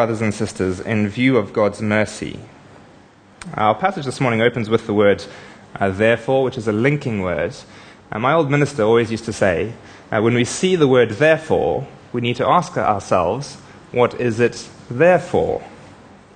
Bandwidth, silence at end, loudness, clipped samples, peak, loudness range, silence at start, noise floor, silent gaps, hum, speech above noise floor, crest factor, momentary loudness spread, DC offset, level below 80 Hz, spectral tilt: 9.8 kHz; 0.4 s; -18 LUFS; under 0.1%; 0 dBFS; 4 LU; 0 s; -47 dBFS; none; none; 29 dB; 18 dB; 14 LU; under 0.1%; -50 dBFS; -6 dB/octave